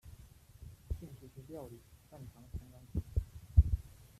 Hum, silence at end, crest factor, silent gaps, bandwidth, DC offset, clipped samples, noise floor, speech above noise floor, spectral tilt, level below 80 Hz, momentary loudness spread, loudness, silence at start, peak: none; 0.4 s; 26 dB; none; 13.5 kHz; under 0.1%; under 0.1%; -57 dBFS; 11 dB; -8.5 dB/octave; -40 dBFS; 26 LU; -37 LUFS; 0.05 s; -12 dBFS